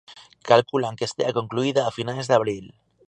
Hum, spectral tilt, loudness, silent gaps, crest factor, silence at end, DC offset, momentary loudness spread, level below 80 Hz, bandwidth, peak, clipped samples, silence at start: none; -5 dB/octave; -23 LUFS; none; 22 dB; 0.4 s; under 0.1%; 10 LU; -64 dBFS; 10 kHz; -2 dBFS; under 0.1%; 0.1 s